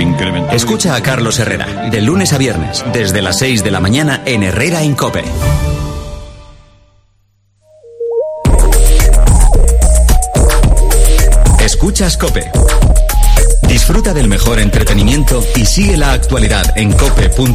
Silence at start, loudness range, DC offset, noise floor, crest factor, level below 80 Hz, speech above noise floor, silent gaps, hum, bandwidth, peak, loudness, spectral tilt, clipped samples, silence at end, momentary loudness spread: 0 s; 7 LU; under 0.1%; -54 dBFS; 8 dB; -10 dBFS; 44 dB; none; none; 15.5 kHz; 0 dBFS; -11 LUFS; -4.5 dB/octave; 0.3%; 0 s; 6 LU